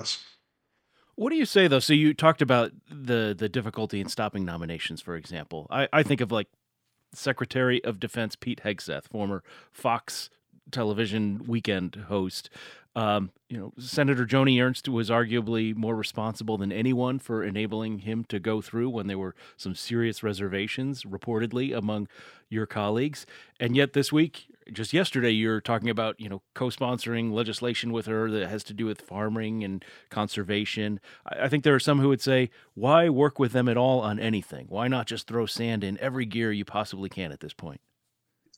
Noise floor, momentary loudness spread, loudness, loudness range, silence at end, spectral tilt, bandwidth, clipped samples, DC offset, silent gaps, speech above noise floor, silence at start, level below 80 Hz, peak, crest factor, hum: -79 dBFS; 14 LU; -27 LUFS; 7 LU; 0.8 s; -5.5 dB/octave; 16.5 kHz; under 0.1%; under 0.1%; none; 51 dB; 0 s; -66 dBFS; -2 dBFS; 24 dB; none